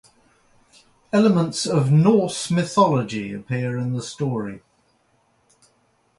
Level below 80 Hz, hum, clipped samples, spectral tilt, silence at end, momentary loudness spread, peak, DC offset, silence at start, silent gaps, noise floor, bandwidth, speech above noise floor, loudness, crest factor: -60 dBFS; none; under 0.1%; -6 dB/octave; 1.6 s; 12 LU; -4 dBFS; under 0.1%; 1.15 s; none; -64 dBFS; 11.5 kHz; 44 dB; -21 LUFS; 18 dB